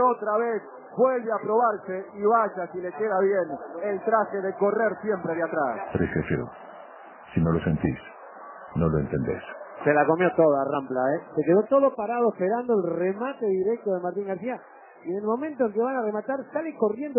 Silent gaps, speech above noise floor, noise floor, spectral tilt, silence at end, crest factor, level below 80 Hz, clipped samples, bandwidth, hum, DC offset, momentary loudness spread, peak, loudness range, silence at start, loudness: none; 21 dB; -45 dBFS; -11.5 dB/octave; 0 s; 18 dB; -50 dBFS; under 0.1%; 3.2 kHz; none; under 0.1%; 12 LU; -6 dBFS; 5 LU; 0 s; -26 LUFS